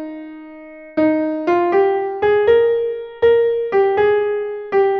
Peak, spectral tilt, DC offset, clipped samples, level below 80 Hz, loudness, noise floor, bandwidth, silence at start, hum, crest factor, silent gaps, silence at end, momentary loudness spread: -4 dBFS; -7.5 dB/octave; under 0.1%; under 0.1%; -52 dBFS; -17 LUFS; -37 dBFS; 5.6 kHz; 0 s; none; 14 dB; none; 0 s; 18 LU